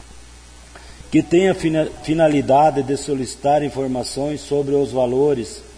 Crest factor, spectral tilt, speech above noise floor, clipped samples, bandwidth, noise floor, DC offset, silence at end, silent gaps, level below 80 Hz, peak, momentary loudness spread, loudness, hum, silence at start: 14 dB; -6 dB/octave; 24 dB; under 0.1%; 10.5 kHz; -42 dBFS; under 0.1%; 0.05 s; none; -44 dBFS; -6 dBFS; 8 LU; -18 LUFS; none; 0.1 s